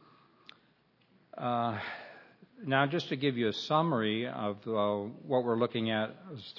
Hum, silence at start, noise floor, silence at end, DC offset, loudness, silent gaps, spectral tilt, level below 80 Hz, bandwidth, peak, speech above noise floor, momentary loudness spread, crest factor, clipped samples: none; 1.35 s; -68 dBFS; 0 s; under 0.1%; -32 LUFS; none; -6.5 dB/octave; -80 dBFS; 6 kHz; -12 dBFS; 37 dB; 13 LU; 20 dB; under 0.1%